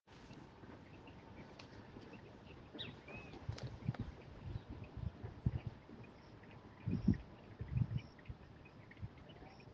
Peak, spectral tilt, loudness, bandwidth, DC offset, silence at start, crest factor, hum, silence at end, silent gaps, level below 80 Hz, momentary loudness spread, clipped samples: -20 dBFS; -7 dB/octave; -47 LUFS; 7.2 kHz; under 0.1%; 0.05 s; 26 dB; none; 0 s; none; -58 dBFS; 17 LU; under 0.1%